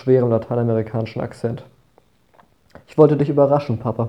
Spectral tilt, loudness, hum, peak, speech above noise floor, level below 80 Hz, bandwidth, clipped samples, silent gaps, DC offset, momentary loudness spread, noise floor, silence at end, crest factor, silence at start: -10 dB/octave; -19 LUFS; none; 0 dBFS; 40 dB; -56 dBFS; 9.2 kHz; under 0.1%; none; under 0.1%; 12 LU; -58 dBFS; 0 s; 20 dB; 0.05 s